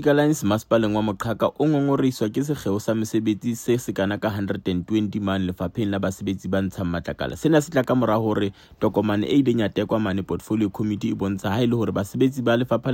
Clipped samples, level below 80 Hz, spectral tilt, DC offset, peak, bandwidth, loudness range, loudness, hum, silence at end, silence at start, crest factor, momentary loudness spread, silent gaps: under 0.1%; -52 dBFS; -6.5 dB/octave; under 0.1%; -6 dBFS; 16.5 kHz; 3 LU; -23 LUFS; none; 0 s; 0 s; 18 dB; 6 LU; none